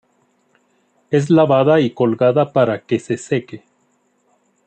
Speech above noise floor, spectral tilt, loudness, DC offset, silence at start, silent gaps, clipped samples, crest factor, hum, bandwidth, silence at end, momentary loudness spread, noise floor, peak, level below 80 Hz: 47 dB; -7 dB/octave; -16 LUFS; under 0.1%; 1.1 s; none; under 0.1%; 16 dB; none; 9 kHz; 1.1 s; 9 LU; -62 dBFS; -2 dBFS; -62 dBFS